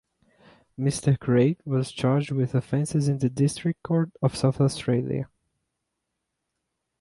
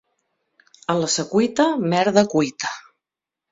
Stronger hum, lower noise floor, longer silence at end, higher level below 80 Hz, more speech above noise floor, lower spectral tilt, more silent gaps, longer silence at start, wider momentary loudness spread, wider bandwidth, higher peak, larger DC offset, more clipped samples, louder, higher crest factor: neither; second, -81 dBFS vs -87 dBFS; first, 1.75 s vs 0.7 s; about the same, -58 dBFS vs -62 dBFS; second, 57 dB vs 68 dB; first, -7 dB/octave vs -4.5 dB/octave; neither; about the same, 0.8 s vs 0.9 s; second, 6 LU vs 11 LU; first, 11.5 kHz vs 8 kHz; second, -8 dBFS vs -2 dBFS; neither; neither; second, -25 LUFS vs -20 LUFS; about the same, 18 dB vs 20 dB